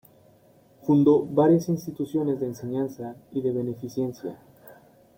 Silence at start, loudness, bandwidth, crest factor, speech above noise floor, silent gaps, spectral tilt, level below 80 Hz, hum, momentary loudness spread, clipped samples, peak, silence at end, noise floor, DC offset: 0.85 s; -25 LUFS; 16.5 kHz; 18 dB; 33 dB; none; -8.5 dB/octave; -66 dBFS; none; 14 LU; under 0.1%; -8 dBFS; 0.45 s; -57 dBFS; under 0.1%